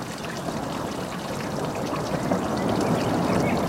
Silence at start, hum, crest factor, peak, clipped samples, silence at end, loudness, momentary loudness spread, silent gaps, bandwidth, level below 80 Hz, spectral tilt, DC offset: 0 s; none; 18 dB; -8 dBFS; under 0.1%; 0 s; -27 LUFS; 7 LU; none; 16 kHz; -48 dBFS; -5.5 dB/octave; under 0.1%